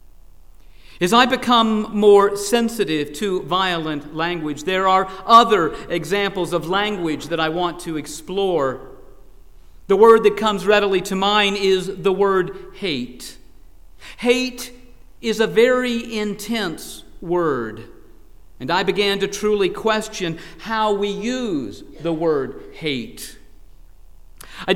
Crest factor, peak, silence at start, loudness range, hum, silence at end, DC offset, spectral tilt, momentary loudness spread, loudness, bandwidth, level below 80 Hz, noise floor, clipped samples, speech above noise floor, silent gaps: 20 dB; 0 dBFS; 0.85 s; 7 LU; none; 0 s; 0.7%; -4.5 dB/octave; 15 LU; -19 LUFS; 16.5 kHz; -46 dBFS; -46 dBFS; under 0.1%; 27 dB; none